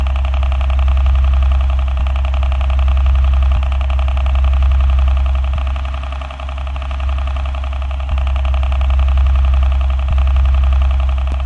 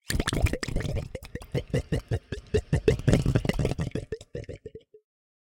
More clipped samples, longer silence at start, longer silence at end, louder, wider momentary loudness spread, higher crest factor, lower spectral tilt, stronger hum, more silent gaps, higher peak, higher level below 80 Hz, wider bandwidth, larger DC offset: neither; about the same, 0 s vs 0.1 s; second, 0 s vs 0.65 s; first, -16 LUFS vs -29 LUFS; second, 7 LU vs 16 LU; second, 8 dB vs 22 dB; about the same, -7 dB/octave vs -6 dB/octave; neither; neither; about the same, -6 dBFS vs -6 dBFS; first, -14 dBFS vs -36 dBFS; second, 4.3 kHz vs 17 kHz; neither